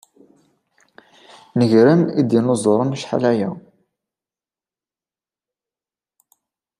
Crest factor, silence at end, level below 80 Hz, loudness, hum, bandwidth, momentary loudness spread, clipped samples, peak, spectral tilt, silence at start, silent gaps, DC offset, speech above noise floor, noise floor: 18 dB; 3.2 s; -66 dBFS; -17 LUFS; none; 11.5 kHz; 12 LU; under 0.1%; -2 dBFS; -7 dB/octave; 1.55 s; none; under 0.1%; over 74 dB; under -90 dBFS